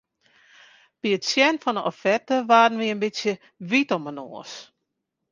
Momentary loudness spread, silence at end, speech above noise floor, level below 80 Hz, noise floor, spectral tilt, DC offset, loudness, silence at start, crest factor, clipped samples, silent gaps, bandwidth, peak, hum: 19 LU; 0.7 s; 57 dB; -74 dBFS; -80 dBFS; -4 dB/octave; under 0.1%; -22 LUFS; 1.05 s; 22 dB; under 0.1%; none; 9.8 kHz; -4 dBFS; none